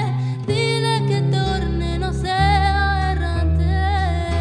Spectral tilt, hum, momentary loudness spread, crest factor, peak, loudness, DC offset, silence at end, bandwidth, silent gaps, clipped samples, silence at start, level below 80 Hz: -6 dB/octave; none; 5 LU; 14 dB; -6 dBFS; -20 LUFS; under 0.1%; 0 s; 10 kHz; none; under 0.1%; 0 s; -24 dBFS